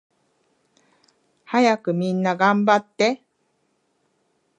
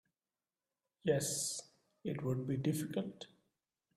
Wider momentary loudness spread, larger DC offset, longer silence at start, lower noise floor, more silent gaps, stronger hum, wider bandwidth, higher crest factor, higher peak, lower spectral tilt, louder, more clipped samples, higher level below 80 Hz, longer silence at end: second, 5 LU vs 13 LU; neither; first, 1.5 s vs 1.05 s; second, -69 dBFS vs under -90 dBFS; neither; neither; second, 9.8 kHz vs 15 kHz; about the same, 20 dB vs 20 dB; first, -2 dBFS vs -20 dBFS; about the same, -5.5 dB/octave vs -5 dB/octave; first, -20 LUFS vs -38 LUFS; neither; about the same, -76 dBFS vs -74 dBFS; first, 1.4 s vs 0.7 s